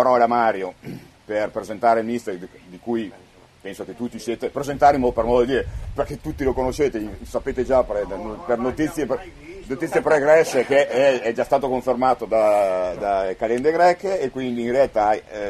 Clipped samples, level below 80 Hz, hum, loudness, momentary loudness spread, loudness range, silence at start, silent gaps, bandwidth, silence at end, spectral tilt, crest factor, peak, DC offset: under 0.1%; -42 dBFS; none; -21 LUFS; 15 LU; 7 LU; 0 s; none; 13.5 kHz; 0 s; -5.5 dB/octave; 18 dB; -4 dBFS; under 0.1%